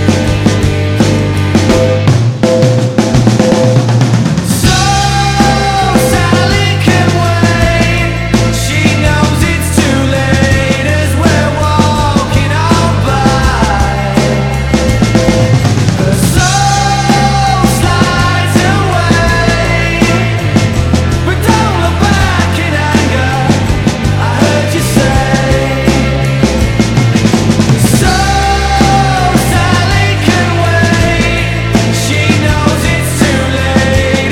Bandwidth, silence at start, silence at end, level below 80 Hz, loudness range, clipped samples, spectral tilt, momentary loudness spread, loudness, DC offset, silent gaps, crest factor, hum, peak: 17 kHz; 0 s; 0 s; -20 dBFS; 1 LU; 1%; -5 dB/octave; 2 LU; -9 LUFS; 0.8%; none; 8 dB; none; 0 dBFS